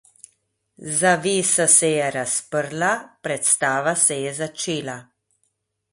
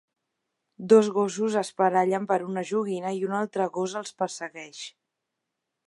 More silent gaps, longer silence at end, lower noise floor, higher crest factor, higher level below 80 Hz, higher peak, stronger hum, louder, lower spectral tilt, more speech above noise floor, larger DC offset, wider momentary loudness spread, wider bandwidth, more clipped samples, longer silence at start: neither; about the same, 0.9 s vs 0.95 s; second, -72 dBFS vs -83 dBFS; about the same, 20 dB vs 20 dB; first, -66 dBFS vs -80 dBFS; first, -2 dBFS vs -6 dBFS; neither; first, -19 LUFS vs -25 LUFS; second, -2.5 dB/octave vs -5 dB/octave; second, 51 dB vs 58 dB; neither; second, 13 LU vs 18 LU; about the same, 12 kHz vs 11.5 kHz; neither; about the same, 0.8 s vs 0.8 s